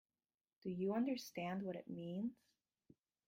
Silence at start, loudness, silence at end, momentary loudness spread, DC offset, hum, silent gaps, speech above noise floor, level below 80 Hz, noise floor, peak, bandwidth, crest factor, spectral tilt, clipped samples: 0.65 s; -44 LUFS; 0.95 s; 9 LU; under 0.1%; none; none; over 47 dB; -84 dBFS; under -90 dBFS; -30 dBFS; 16 kHz; 16 dB; -6.5 dB/octave; under 0.1%